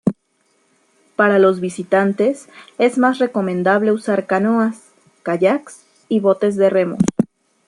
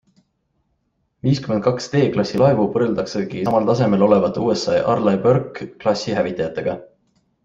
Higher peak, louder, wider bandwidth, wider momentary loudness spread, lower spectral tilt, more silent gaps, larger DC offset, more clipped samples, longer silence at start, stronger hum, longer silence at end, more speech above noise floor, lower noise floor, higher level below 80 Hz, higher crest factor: about the same, -2 dBFS vs -2 dBFS; about the same, -17 LUFS vs -19 LUFS; first, 11.5 kHz vs 7.8 kHz; about the same, 9 LU vs 8 LU; about the same, -6.5 dB/octave vs -7 dB/octave; neither; neither; neither; second, 0.05 s vs 1.25 s; neither; second, 0.4 s vs 0.6 s; second, 47 dB vs 51 dB; second, -63 dBFS vs -69 dBFS; about the same, -56 dBFS vs -52 dBFS; about the same, 16 dB vs 18 dB